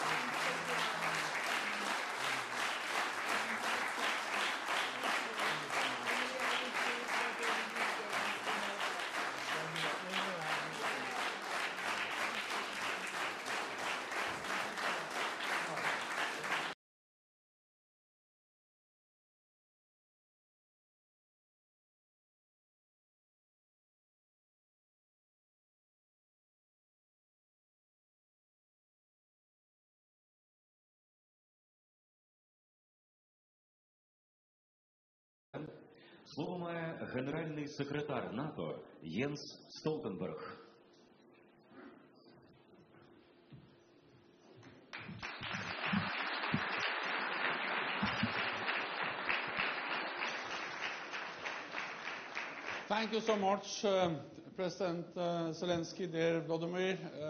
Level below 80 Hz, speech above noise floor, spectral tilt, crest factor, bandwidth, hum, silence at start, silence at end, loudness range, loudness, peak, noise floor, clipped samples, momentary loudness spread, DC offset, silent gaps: -78 dBFS; 26 dB; -3.5 dB/octave; 22 dB; 14 kHz; none; 0 s; 0 s; 11 LU; -37 LUFS; -18 dBFS; -64 dBFS; under 0.1%; 8 LU; under 0.1%; 16.74-35.53 s